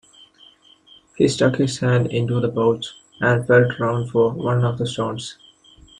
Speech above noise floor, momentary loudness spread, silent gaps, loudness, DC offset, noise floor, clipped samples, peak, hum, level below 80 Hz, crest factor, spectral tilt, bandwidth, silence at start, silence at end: 32 dB; 10 LU; none; -20 LUFS; under 0.1%; -51 dBFS; under 0.1%; -2 dBFS; none; -54 dBFS; 18 dB; -6 dB/octave; 10.5 kHz; 1.2 s; 0.65 s